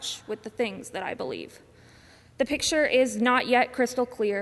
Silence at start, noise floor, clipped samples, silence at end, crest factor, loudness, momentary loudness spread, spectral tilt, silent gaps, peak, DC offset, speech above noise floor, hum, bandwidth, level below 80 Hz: 0 s; -54 dBFS; under 0.1%; 0 s; 18 dB; -26 LUFS; 13 LU; -3 dB/octave; none; -10 dBFS; under 0.1%; 28 dB; none; 12 kHz; -60 dBFS